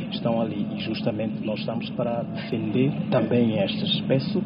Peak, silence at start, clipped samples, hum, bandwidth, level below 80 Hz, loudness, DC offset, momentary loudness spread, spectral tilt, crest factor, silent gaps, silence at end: -8 dBFS; 0 s; under 0.1%; none; 5.4 kHz; -58 dBFS; -25 LUFS; under 0.1%; 7 LU; -5.5 dB/octave; 16 dB; none; 0 s